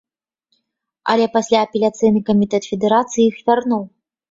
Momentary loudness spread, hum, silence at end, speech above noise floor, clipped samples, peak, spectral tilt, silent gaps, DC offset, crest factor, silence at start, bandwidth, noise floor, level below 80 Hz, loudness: 7 LU; none; 0.45 s; 57 dB; under 0.1%; -2 dBFS; -5.5 dB/octave; none; under 0.1%; 16 dB; 1.05 s; 7.8 kHz; -73 dBFS; -58 dBFS; -17 LUFS